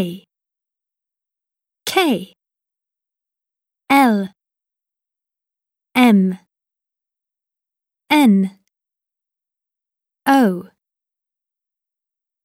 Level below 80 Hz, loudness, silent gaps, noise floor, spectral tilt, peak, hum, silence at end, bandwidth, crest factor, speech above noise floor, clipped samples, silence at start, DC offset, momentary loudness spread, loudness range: -72 dBFS; -16 LUFS; none; -87 dBFS; -5.5 dB/octave; -2 dBFS; none; 1.8 s; 16.5 kHz; 20 dB; 73 dB; under 0.1%; 0 s; under 0.1%; 16 LU; 6 LU